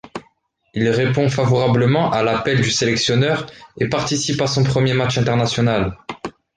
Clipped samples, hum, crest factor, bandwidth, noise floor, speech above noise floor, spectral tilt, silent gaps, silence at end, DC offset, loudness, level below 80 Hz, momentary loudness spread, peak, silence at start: under 0.1%; none; 14 dB; 9.6 kHz; -60 dBFS; 43 dB; -5 dB/octave; none; 0.25 s; under 0.1%; -18 LUFS; -46 dBFS; 14 LU; -4 dBFS; 0.05 s